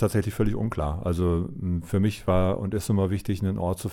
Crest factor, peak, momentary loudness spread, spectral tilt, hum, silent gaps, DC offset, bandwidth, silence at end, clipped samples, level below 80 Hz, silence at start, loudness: 14 dB; -10 dBFS; 4 LU; -7.5 dB/octave; none; none; under 0.1%; 16.5 kHz; 0 s; under 0.1%; -38 dBFS; 0 s; -26 LUFS